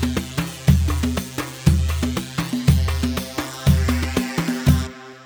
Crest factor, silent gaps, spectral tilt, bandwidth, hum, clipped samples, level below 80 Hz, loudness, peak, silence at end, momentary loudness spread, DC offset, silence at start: 18 dB; none; -5.5 dB/octave; over 20 kHz; none; under 0.1%; -26 dBFS; -21 LUFS; -2 dBFS; 0 s; 7 LU; under 0.1%; 0 s